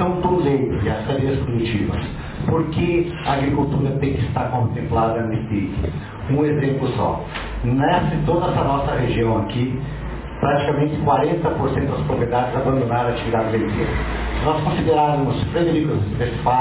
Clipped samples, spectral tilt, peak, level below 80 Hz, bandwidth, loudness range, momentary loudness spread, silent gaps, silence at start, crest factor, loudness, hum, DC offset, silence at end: under 0.1%; -11.5 dB/octave; -6 dBFS; -32 dBFS; 4 kHz; 1 LU; 6 LU; none; 0 s; 14 dB; -20 LUFS; none; under 0.1%; 0 s